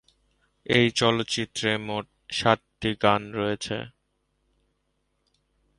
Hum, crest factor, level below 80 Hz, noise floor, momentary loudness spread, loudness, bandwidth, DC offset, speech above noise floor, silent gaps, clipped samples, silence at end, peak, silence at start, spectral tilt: 50 Hz at -60 dBFS; 24 dB; -56 dBFS; -74 dBFS; 12 LU; -25 LUFS; 11.5 kHz; under 0.1%; 49 dB; none; under 0.1%; 1.9 s; -4 dBFS; 0.7 s; -4.5 dB/octave